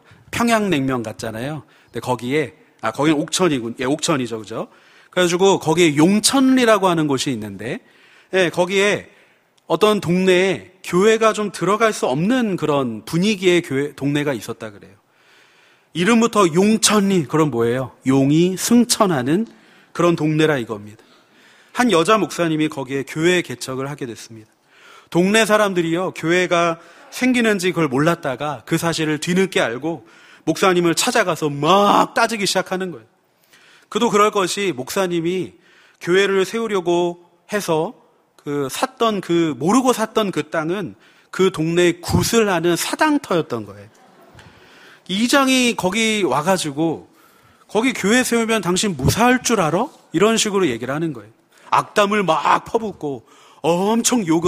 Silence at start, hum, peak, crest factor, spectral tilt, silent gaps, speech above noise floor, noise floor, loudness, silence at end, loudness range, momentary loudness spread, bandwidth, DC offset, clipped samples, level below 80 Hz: 0.35 s; none; 0 dBFS; 18 dB; -4.5 dB/octave; none; 38 dB; -56 dBFS; -18 LUFS; 0 s; 4 LU; 13 LU; 15.5 kHz; under 0.1%; under 0.1%; -52 dBFS